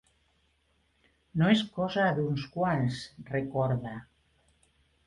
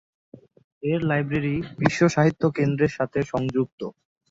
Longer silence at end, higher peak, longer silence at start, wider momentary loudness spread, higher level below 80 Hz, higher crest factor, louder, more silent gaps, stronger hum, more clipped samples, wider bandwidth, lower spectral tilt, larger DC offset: first, 1.05 s vs 0.4 s; second, -10 dBFS vs -2 dBFS; first, 1.35 s vs 0.85 s; first, 13 LU vs 10 LU; second, -60 dBFS vs -54 dBFS; about the same, 22 dB vs 22 dB; second, -29 LUFS vs -23 LUFS; second, none vs 3.72-3.78 s; neither; neither; first, 11 kHz vs 7.8 kHz; about the same, -7 dB/octave vs -7 dB/octave; neither